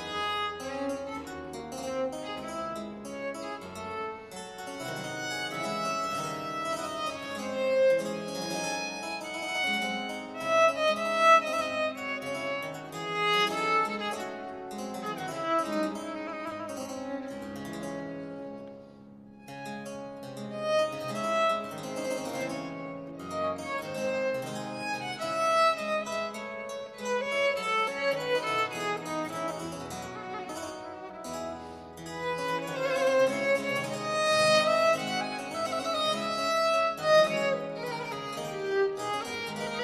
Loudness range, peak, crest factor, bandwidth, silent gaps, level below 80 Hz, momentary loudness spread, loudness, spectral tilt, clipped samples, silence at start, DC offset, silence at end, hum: 10 LU; -10 dBFS; 22 dB; 15.5 kHz; none; -66 dBFS; 15 LU; -30 LUFS; -3.5 dB/octave; under 0.1%; 0 s; under 0.1%; 0 s; none